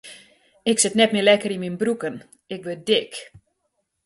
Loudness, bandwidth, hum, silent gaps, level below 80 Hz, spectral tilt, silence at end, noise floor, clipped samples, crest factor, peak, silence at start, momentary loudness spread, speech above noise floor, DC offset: -21 LUFS; 12 kHz; none; none; -66 dBFS; -3 dB/octave; 0.65 s; -74 dBFS; under 0.1%; 20 dB; -4 dBFS; 0.05 s; 19 LU; 53 dB; under 0.1%